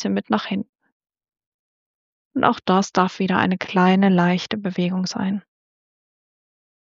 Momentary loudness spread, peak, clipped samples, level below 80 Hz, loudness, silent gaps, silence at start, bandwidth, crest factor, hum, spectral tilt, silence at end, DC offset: 11 LU; -2 dBFS; under 0.1%; -64 dBFS; -20 LUFS; 0.69-0.73 s, 0.92-1.00 s, 1.46-2.31 s; 0 s; 7.4 kHz; 20 dB; none; -5 dB/octave; 1.45 s; under 0.1%